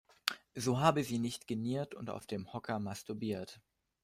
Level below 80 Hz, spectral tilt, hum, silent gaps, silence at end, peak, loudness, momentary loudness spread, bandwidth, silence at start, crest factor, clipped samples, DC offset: -70 dBFS; -5 dB/octave; none; none; 0.45 s; -10 dBFS; -37 LUFS; 12 LU; 16 kHz; 0.25 s; 28 dB; under 0.1%; under 0.1%